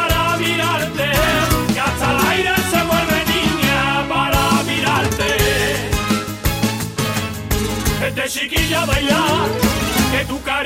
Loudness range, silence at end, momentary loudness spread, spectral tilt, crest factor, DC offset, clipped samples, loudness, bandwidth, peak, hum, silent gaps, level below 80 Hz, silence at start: 3 LU; 0 s; 5 LU; -4 dB/octave; 12 dB; under 0.1%; under 0.1%; -17 LUFS; 16.5 kHz; -4 dBFS; none; none; -30 dBFS; 0 s